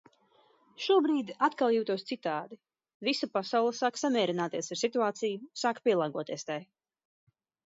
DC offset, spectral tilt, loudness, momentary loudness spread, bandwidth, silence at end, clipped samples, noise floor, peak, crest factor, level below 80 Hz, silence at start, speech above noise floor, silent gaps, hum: under 0.1%; -4 dB/octave; -31 LUFS; 10 LU; 7.8 kHz; 1.1 s; under 0.1%; -66 dBFS; -14 dBFS; 18 dB; -86 dBFS; 0.8 s; 36 dB; 2.94-3.00 s; none